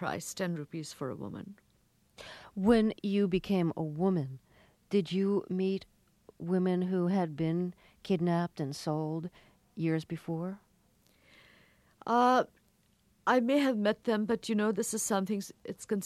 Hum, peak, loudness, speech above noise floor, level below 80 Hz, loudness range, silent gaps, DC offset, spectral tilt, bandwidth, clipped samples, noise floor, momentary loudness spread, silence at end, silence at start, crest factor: none; -12 dBFS; -32 LUFS; 39 dB; -64 dBFS; 5 LU; none; under 0.1%; -6 dB/octave; 14.5 kHz; under 0.1%; -69 dBFS; 17 LU; 0 s; 0 s; 20 dB